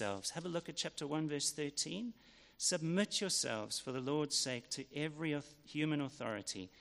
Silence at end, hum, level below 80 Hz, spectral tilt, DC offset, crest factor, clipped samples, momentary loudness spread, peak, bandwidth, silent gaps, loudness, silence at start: 0 s; none; -76 dBFS; -3 dB/octave; under 0.1%; 18 dB; under 0.1%; 8 LU; -22 dBFS; 14 kHz; none; -39 LUFS; 0 s